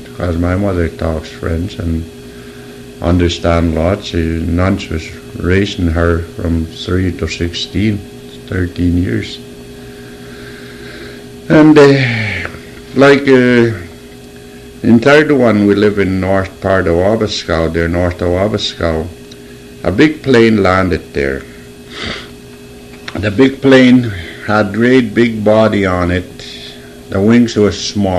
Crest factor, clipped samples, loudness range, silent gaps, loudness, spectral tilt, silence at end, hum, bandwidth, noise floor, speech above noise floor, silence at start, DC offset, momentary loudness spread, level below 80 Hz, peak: 12 dB; 0.2%; 7 LU; none; -12 LUFS; -6.5 dB/octave; 0 s; none; 13.5 kHz; -33 dBFS; 22 dB; 0 s; under 0.1%; 23 LU; -30 dBFS; 0 dBFS